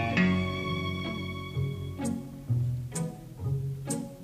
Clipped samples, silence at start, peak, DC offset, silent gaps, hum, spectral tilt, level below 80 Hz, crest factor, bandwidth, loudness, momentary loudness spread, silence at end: under 0.1%; 0 s; -14 dBFS; under 0.1%; none; none; -5.5 dB/octave; -52 dBFS; 18 dB; 15.5 kHz; -32 LUFS; 9 LU; 0 s